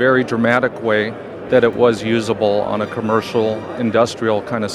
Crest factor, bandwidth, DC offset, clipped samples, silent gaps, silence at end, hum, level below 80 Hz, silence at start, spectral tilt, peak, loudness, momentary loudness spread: 16 dB; 12.5 kHz; under 0.1%; under 0.1%; none; 0 s; none; -54 dBFS; 0 s; -6 dB/octave; 0 dBFS; -17 LUFS; 6 LU